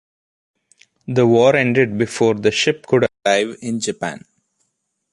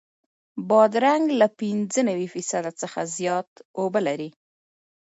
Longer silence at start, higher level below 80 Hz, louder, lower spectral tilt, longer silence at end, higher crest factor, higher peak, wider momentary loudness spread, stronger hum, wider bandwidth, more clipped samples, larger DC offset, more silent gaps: first, 1.1 s vs 0.55 s; first, -56 dBFS vs -76 dBFS; first, -17 LUFS vs -23 LUFS; about the same, -5 dB/octave vs -4.5 dB/octave; about the same, 0.95 s vs 0.85 s; about the same, 16 dB vs 20 dB; about the same, -2 dBFS vs -4 dBFS; about the same, 12 LU vs 14 LU; neither; first, 11.5 kHz vs 8.2 kHz; neither; neither; second, none vs 3.47-3.56 s, 3.65-3.74 s